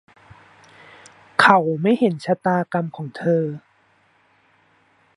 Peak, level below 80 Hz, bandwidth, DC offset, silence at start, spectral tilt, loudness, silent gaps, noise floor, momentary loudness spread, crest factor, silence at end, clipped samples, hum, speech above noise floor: 0 dBFS; -66 dBFS; 11.5 kHz; under 0.1%; 1.4 s; -6.5 dB/octave; -19 LUFS; none; -60 dBFS; 13 LU; 22 dB; 1.6 s; under 0.1%; none; 40 dB